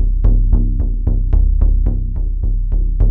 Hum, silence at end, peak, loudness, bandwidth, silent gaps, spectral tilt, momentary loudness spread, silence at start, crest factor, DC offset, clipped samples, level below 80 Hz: none; 0 s; -2 dBFS; -18 LUFS; 1.2 kHz; none; -13 dB/octave; 6 LU; 0 s; 12 dB; under 0.1%; under 0.1%; -12 dBFS